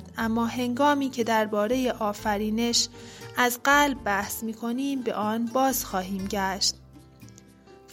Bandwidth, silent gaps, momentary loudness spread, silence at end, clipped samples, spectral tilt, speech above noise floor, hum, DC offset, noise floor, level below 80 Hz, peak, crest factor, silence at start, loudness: 16.5 kHz; none; 9 LU; 0 s; under 0.1%; -3 dB/octave; 26 dB; none; under 0.1%; -51 dBFS; -52 dBFS; -8 dBFS; 20 dB; 0 s; -25 LUFS